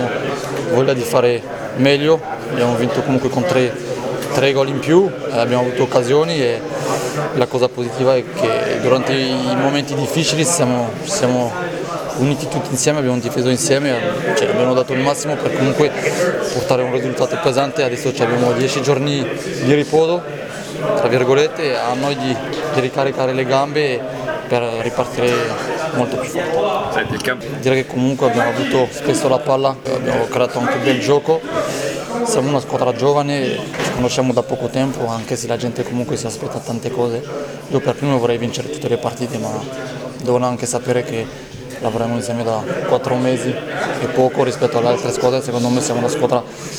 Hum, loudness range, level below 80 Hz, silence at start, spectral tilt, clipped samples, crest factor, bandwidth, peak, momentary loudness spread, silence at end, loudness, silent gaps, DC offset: none; 4 LU; -50 dBFS; 0 s; -5 dB/octave; under 0.1%; 18 dB; 19.5 kHz; 0 dBFS; 7 LU; 0 s; -17 LUFS; none; under 0.1%